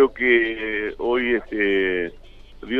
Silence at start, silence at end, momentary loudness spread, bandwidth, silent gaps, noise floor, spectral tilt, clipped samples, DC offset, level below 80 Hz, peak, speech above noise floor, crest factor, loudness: 0 s; 0 s; 8 LU; 4.7 kHz; none; -40 dBFS; -6.5 dB/octave; under 0.1%; under 0.1%; -44 dBFS; -4 dBFS; 19 dB; 18 dB; -21 LUFS